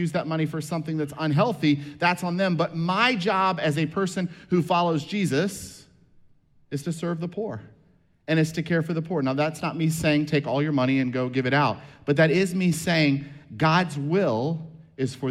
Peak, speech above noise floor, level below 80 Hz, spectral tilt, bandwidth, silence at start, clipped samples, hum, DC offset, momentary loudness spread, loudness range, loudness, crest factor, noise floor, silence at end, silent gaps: -6 dBFS; 36 dB; -60 dBFS; -6 dB/octave; 14.5 kHz; 0 s; under 0.1%; none; under 0.1%; 10 LU; 6 LU; -24 LUFS; 18 dB; -60 dBFS; 0 s; none